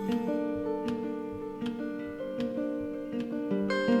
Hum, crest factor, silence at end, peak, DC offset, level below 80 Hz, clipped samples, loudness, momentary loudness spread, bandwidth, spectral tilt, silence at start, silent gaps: none; 16 dB; 0 s; -14 dBFS; under 0.1%; -60 dBFS; under 0.1%; -33 LUFS; 7 LU; 13 kHz; -7 dB/octave; 0 s; none